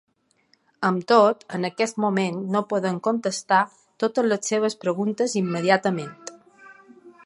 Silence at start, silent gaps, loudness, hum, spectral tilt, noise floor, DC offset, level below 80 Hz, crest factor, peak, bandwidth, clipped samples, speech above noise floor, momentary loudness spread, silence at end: 0.8 s; none; -23 LUFS; none; -5 dB/octave; -65 dBFS; under 0.1%; -76 dBFS; 20 dB; -2 dBFS; 11.5 kHz; under 0.1%; 42 dB; 10 LU; 0.15 s